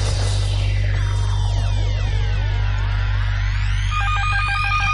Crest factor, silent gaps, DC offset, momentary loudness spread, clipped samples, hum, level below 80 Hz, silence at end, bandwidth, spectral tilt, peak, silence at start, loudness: 10 dB; none; under 0.1%; 3 LU; under 0.1%; none; -22 dBFS; 0 s; 11 kHz; -4.5 dB/octave; -8 dBFS; 0 s; -21 LUFS